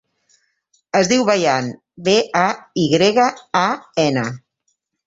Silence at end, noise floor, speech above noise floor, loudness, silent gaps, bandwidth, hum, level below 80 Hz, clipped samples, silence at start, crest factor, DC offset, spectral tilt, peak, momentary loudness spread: 0.7 s; -70 dBFS; 53 dB; -17 LUFS; none; 8 kHz; none; -58 dBFS; under 0.1%; 0.95 s; 18 dB; under 0.1%; -4.5 dB/octave; -2 dBFS; 8 LU